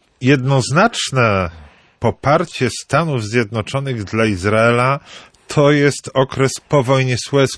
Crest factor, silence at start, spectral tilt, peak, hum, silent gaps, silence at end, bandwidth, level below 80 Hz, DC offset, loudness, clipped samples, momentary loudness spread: 14 dB; 0.2 s; -5.5 dB/octave; -2 dBFS; none; none; 0 s; 11 kHz; -46 dBFS; under 0.1%; -16 LUFS; under 0.1%; 8 LU